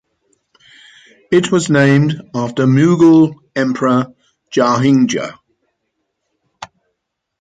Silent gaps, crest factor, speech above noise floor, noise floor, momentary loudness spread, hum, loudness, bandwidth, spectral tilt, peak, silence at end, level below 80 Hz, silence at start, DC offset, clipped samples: none; 14 dB; 62 dB; -74 dBFS; 18 LU; none; -13 LUFS; 9.4 kHz; -6.5 dB/octave; -2 dBFS; 0.75 s; -58 dBFS; 1.3 s; under 0.1%; under 0.1%